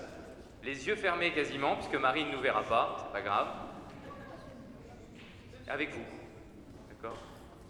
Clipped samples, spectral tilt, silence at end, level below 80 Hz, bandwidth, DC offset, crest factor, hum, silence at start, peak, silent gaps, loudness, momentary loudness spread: under 0.1%; -4.5 dB/octave; 0 s; -60 dBFS; over 20 kHz; under 0.1%; 22 dB; none; 0 s; -14 dBFS; none; -33 LUFS; 21 LU